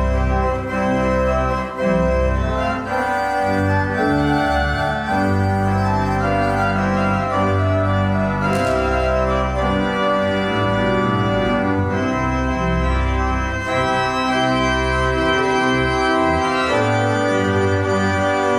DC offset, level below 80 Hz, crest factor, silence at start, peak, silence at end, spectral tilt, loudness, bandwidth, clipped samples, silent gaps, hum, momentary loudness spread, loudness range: under 0.1%; -28 dBFS; 12 dB; 0 s; -6 dBFS; 0 s; -6.5 dB/octave; -18 LUFS; 14.5 kHz; under 0.1%; none; none; 3 LU; 2 LU